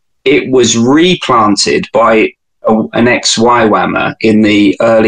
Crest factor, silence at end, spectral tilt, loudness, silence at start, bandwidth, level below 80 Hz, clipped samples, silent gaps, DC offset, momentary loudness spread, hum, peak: 8 dB; 0 s; -4 dB/octave; -9 LUFS; 0.25 s; 10 kHz; -44 dBFS; under 0.1%; none; under 0.1%; 4 LU; none; 0 dBFS